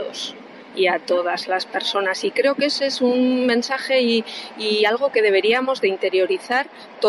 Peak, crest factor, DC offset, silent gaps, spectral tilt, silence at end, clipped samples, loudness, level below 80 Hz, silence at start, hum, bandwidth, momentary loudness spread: -6 dBFS; 14 dB; under 0.1%; none; -3 dB/octave; 0 s; under 0.1%; -20 LUFS; -72 dBFS; 0 s; none; 12 kHz; 9 LU